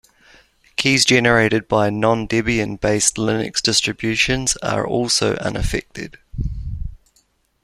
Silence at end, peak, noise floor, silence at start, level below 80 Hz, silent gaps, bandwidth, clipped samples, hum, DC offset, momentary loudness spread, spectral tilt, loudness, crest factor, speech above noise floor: 0.7 s; 0 dBFS; -62 dBFS; 0.8 s; -34 dBFS; none; 14.5 kHz; under 0.1%; none; under 0.1%; 16 LU; -3.5 dB/octave; -18 LUFS; 18 dB; 43 dB